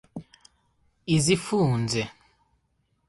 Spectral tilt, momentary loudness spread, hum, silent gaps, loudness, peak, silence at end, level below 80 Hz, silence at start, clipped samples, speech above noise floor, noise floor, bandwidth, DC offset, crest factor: -5 dB/octave; 20 LU; none; none; -25 LUFS; -8 dBFS; 1 s; -56 dBFS; 0.15 s; under 0.1%; 48 dB; -71 dBFS; 11.5 kHz; under 0.1%; 20 dB